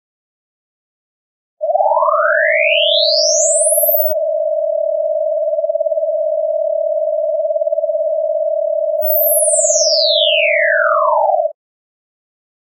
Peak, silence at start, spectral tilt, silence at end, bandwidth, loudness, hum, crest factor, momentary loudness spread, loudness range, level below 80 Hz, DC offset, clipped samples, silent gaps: 0 dBFS; 1.6 s; 7.5 dB/octave; 1.15 s; 8.2 kHz; -14 LUFS; none; 16 dB; 6 LU; 5 LU; under -90 dBFS; under 0.1%; under 0.1%; none